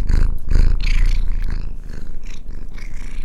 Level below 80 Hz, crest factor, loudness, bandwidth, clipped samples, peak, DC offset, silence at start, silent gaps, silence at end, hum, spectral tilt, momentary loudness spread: -16 dBFS; 14 dB; -24 LUFS; 7.2 kHz; under 0.1%; 0 dBFS; under 0.1%; 0 s; none; 0 s; none; -6 dB/octave; 15 LU